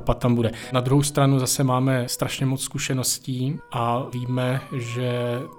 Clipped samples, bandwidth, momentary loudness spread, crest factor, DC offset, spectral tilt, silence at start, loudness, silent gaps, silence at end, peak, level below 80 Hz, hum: under 0.1%; 17.5 kHz; 8 LU; 16 dB; under 0.1%; -5 dB/octave; 0 s; -23 LUFS; none; 0 s; -8 dBFS; -44 dBFS; none